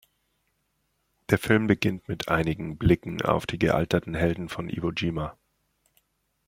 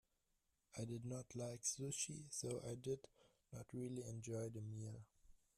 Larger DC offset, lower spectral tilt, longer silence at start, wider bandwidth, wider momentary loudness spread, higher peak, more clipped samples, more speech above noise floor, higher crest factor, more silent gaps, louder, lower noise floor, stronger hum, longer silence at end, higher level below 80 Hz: neither; first, -6.5 dB/octave vs -4.5 dB/octave; first, 1.3 s vs 0.75 s; about the same, 16.5 kHz vs 15 kHz; about the same, 10 LU vs 12 LU; first, -4 dBFS vs -30 dBFS; neither; first, 48 dB vs 37 dB; about the same, 24 dB vs 20 dB; neither; first, -26 LUFS vs -49 LUFS; second, -74 dBFS vs -86 dBFS; neither; first, 1.15 s vs 0.2 s; first, -46 dBFS vs -76 dBFS